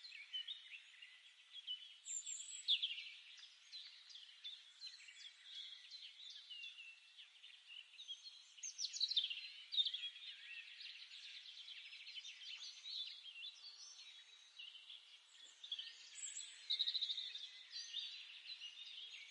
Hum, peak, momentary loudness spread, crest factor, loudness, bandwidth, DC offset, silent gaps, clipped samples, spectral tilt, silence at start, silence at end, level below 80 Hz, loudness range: none; -26 dBFS; 18 LU; 24 dB; -46 LUFS; 11 kHz; under 0.1%; none; under 0.1%; 8 dB/octave; 0 s; 0 s; under -90 dBFS; 11 LU